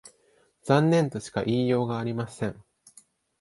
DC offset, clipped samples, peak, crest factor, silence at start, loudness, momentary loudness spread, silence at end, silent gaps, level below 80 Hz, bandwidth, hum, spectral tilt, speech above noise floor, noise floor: under 0.1%; under 0.1%; -6 dBFS; 22 dB; 0.05 s; -26 LUFS; 12 LU; 0.8 s; none; -60 dBFS; 11.5 kHz; none; -7 dB/octave; 40 dB; -65 dBFS